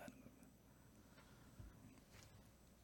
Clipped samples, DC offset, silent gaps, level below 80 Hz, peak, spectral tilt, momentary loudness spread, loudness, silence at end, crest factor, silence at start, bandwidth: under 0.1%; under 0.1%; none; -72 dBFS; -40 dBFS; -5 dB/octave; 5 LU; -65 LUFS; 0 s; 24 dB; 0 s; 18 kHz